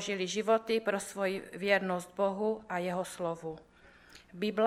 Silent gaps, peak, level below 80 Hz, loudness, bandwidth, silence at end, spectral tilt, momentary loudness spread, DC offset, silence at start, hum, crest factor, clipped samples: none; -12 dBFS; -70 dBFS; -33 LUFS; 15 kHz; 0 s; -4.5 dB/octave; 9 LU; under 0.1%; 0 s; none; 22 dB; under 0.1%